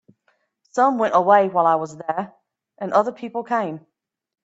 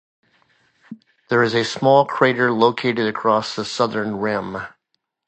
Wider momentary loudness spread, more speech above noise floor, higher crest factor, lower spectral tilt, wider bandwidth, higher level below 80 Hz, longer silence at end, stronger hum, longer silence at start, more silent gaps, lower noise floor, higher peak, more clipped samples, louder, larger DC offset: first, 15 LU vs 10 LU; second, 48 dB vs 55 dB; about the same, 18 dB vs 20 dB; about the same, -6 dB/octave vs -5 dB/octave; about the same, 8 kHz vs 8.8 kHz; second, -72 dBFS vs -60 dBFS; about the same, 0.7 s vs 0.6 s; neither; second, 0.75 s vs 0.9 s; neither; second, -67 dBFS vs -74 dBFS; about the same, -2 dBFS vs 0 dBFS; neither; about the same, -20 LUFS vs -19 LUFS; neither